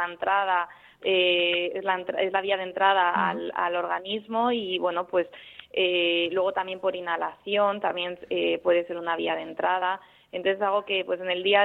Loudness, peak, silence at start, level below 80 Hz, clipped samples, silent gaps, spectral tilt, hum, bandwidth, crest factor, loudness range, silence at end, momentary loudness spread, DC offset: -26 LUFS; -6 dBFS; 0 s; -70 dBFS; under 0.1%; none; -6.5 dB/octave; none; 4.2 kHz; 20 dB; 3 LU; 0 s; 8 LU; under 0.1%